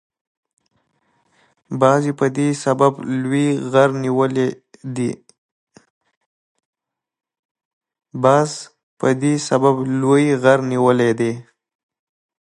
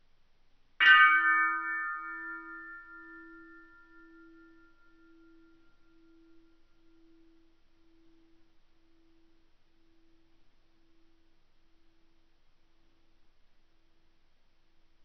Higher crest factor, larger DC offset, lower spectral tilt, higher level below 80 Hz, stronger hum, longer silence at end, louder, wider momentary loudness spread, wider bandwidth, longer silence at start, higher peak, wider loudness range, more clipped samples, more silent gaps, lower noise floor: second, 18 dB vs 26 dB; neither; first, -6.5 dB/octave vs 4.5 dB/octave; about the same, -66 dBFS vs -66 dBFS; neither; second, 1 s vs 11.85 s; first, -17 LUFS vs -24 LUFS; second, 10 LU vs 30 LU; first, 11.5 kHz vs 6.2 kHz; first, 1.7 s vs 0.8 s; first, 0 dBFS vs -8 dBFS; second, 9 LU vs 26 LU; neither; first, 5.38-5.67 s, 5.90-6.01 s, 6.17-6.55 s, 6.65-6.73 s, 7.39-7.55 s, 7.65-7.81 s, 8.83-8.97 s vs none; about the same, -66 dBFS vs -63 dBFS